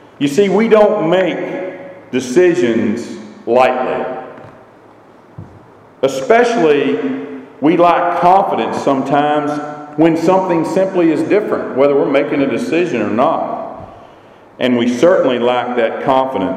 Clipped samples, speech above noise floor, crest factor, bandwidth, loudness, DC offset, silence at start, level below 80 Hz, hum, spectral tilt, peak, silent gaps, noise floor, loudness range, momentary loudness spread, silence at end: under 0.1%; 30 dB; 14 dB; 13.5 kHz; -14 LUFS; under 0.1%; 0.2 s; -56 dBFS; none; -6 dB/octave; 0 dBFS; none; -42 dBFS; 4 LU; 13 LU; 0 s